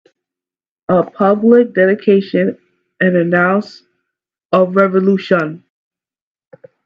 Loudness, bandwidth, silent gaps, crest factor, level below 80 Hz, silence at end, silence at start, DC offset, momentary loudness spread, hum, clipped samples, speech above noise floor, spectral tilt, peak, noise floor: -13 LUFS; 6.8 kHz; 4.45-4.49 s; 16 dB; -64 dBFS; 1.3 s; 0.9 s; under 0.1%; 8 LU; none; under 0.1%; over 78 dB; -9 dB/octave; 0 dBFS; under -90 dBFS